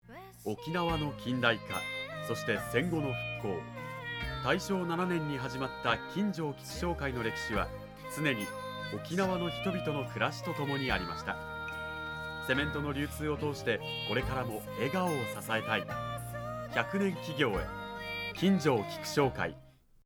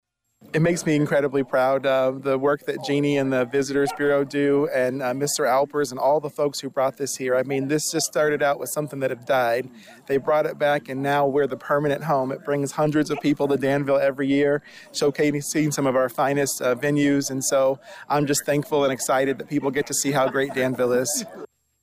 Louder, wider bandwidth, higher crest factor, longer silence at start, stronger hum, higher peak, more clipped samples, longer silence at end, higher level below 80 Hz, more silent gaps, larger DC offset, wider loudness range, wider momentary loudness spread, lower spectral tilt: second, -34 LUFS vs -22 LUFS; first, 19.5 kHz vs 16 kHz; first, 24 dB vs 10 dB; second, 0.05 s vs 0.55 s; neither; about the same, -10 dBFS vs -12 dBFS; neither; about the same, 0.35 s vs 0.4 s; first, -52 dBFS vs -62 dBFS; neither; neither; about the same, 2 LU vs 1 LU; first, 8 LU vs 5 LU; about the same, -5.5 dB/octave vs -4.5 dB/octave